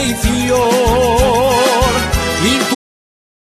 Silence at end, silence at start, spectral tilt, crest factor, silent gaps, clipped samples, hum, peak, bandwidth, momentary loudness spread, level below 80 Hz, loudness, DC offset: 0.75 s; 0 s; -4 dB/octave; 12 dB; none; under 0.1%; none; 0 dBFS; 14 kHz; 4 LU; -24 dBFS; -13 LUFS; under 0.1%